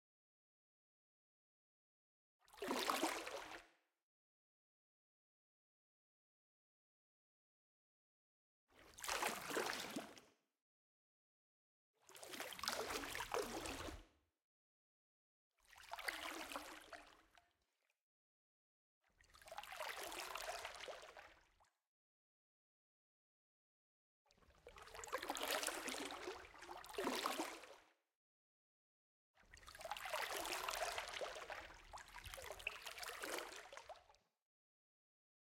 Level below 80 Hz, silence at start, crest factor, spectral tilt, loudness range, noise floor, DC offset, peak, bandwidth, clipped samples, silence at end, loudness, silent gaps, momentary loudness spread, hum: -74 dBFS; 2.5 s; 30 dB; -1.5 dB/octave; 8 LU; -88 dBFS; under 0.1%; -22 dBFS; 16.5 kHz; under 0.1%; 1.4 s; -47 LUFS; 4.03-8.67 s, 10.62-11.94 s, 14.44-15.51 s, 18.01-19.01 s, 21.87-24.25 s, 28.15-29.34 s; 18 LU; none